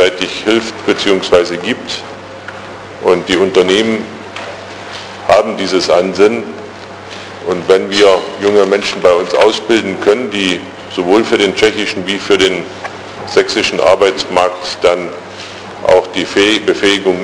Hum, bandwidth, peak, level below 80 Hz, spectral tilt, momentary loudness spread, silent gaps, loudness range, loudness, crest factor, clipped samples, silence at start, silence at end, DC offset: none; 10.5 kHz; 0 dBFS; -48 dBFS; -3.5 dB/octave; 16 LU; none; 3 LU; -12 LUFS; 12 dB; 0.2%; 0 s; 0 s; under 0.1%